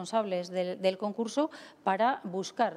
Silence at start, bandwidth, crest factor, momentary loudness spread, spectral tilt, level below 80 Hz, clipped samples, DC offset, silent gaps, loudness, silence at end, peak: 0 s; 13 kHz; 18 dB; 7 LU; -5 dB/octave; -84 dBFS; under 0.1%; under 0.1%; none; -31 LUFS; 0 s; -14 dBFS